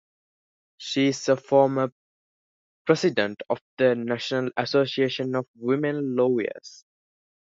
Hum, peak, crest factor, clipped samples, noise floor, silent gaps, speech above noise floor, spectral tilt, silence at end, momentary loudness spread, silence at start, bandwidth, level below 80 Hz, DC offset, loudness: none; -4 dBFS; 20 dB; under 0.1%; under -90 dBFS; 1.92-2.85 s, 3.61-3.77 s, 5.48-5.54 s; over 66 dB; -5.5 dB/octave; 0.7 s; 10 LU; 0.8 s; 7.8 kHz; -72 dBFS; under 0.1%; -24 LUFS